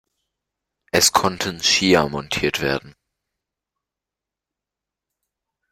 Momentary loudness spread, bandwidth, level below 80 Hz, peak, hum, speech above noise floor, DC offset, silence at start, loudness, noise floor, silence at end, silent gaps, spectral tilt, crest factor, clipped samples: 8 LU; 16 kHz; -52 dBFS; -2 dBFS; none; 68 dB; under 0.1%; 0.95 s; -18 LUFS; -87 dBFS; 2.8 s; none; -2.5 dB/octave; 22 dB; under 0.1%